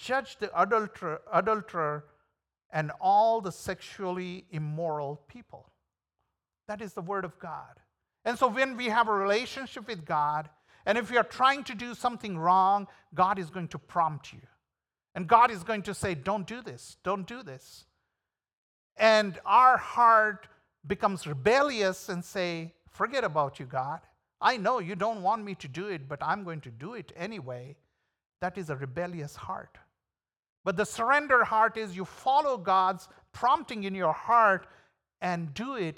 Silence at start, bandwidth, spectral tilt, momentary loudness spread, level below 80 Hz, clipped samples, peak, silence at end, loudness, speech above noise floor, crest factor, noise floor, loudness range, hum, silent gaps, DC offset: 0 s; 17 kHz; -5 dB/octave; 17 LU; -66 dBFS; under 0.1%; -6 dBFS; 0.05 s; -28 LUFS; 61 dB; 22 dB; -90 dBFS; 13 LU; none; 2.65-2.70 s, 18.57-18.90 s, 28.26-28.30 s, 30.39-30.43 s, 30.49-30.64 s; under 0.1%